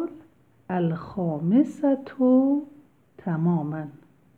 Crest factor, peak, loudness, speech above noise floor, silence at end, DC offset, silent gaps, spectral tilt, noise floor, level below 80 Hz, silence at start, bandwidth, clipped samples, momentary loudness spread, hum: 16 dB; -10 dBFS; -24 LUFS; 33 dB; 0.4 s; under 0.1%; none; -10 dB/octave; -56 dBFS; -66 dBFS; 0 s; 7.4 kHz; under 0.1%; 15 LU; none